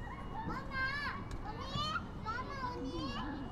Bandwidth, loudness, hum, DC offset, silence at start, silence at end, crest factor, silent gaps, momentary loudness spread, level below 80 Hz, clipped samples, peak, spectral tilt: 13 kHz; -40 LUFS; none; under 0.1%; 0 s; 0 s; 14 dB; none; 7 LU; -48 dBFS; under 0.1%; -26 dBFS; -5 dB/octave